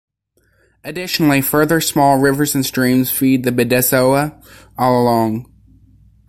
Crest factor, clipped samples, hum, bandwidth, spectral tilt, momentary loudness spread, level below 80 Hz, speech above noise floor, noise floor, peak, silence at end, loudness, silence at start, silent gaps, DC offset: 14 dB; under 0.1%; none; 16.5 kHz; -4.5 dB/octave; 12 LU; -48 dBFS; 46 dB; -61 dBFS; -2 dBFS; 0.85 s; -15 LUFS; 0.85 s; none; under 0.1%